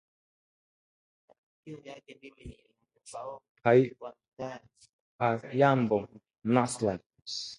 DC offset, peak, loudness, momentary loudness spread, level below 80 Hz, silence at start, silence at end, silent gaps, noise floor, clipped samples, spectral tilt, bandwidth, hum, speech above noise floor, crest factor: under 0.1%; -10 dBFS; -29 LUFS; 24 LU; -64 dBFS; 1.65 s; 0.05 s; 3.49-3.55 s, 4.28-4.37 s, 4.89-5.19 s, 7.06-7.10 s; under -90 dBFS; under 0.1%; -6 dB/octave; 11.5 kHz; none; over 60 dB; 22 dB